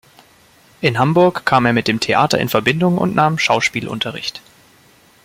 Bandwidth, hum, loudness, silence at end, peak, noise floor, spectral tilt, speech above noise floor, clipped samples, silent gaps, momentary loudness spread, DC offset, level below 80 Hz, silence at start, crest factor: 16.5 kHz; none; -16 LUFS; 0.85 s; 0 dBFS; -50 dBFS; -5 dB/octave; 34 dB; under 0.1%; none; 8 LU; under 0.1%; -52 dBFS; 0.8 s; 16 dB